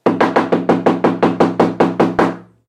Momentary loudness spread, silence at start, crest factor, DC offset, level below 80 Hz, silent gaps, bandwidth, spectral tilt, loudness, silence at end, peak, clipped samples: 1 LU; 0.05 s; 14 dB; under 0.1%; -50 dBFS; none; 11 kHz; -7.5 dB/octave; -15 LUFS; 0.25 s; 0 dBFS; under 0.1%